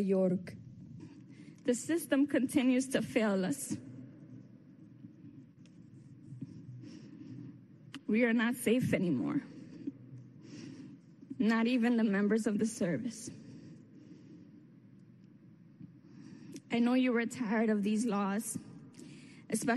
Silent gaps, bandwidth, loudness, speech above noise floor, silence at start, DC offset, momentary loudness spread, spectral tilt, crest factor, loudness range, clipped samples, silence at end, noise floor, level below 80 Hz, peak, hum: none; 12.5 kHz; -32 LUFS; 27 dB; 0 s; under 0.1%; 24 LU; -5.5 dB/octave; 18 dB; 18 LU; under 0.1%; 0 s; -58 dBFS; -76 dBFS; -16 dBFS; none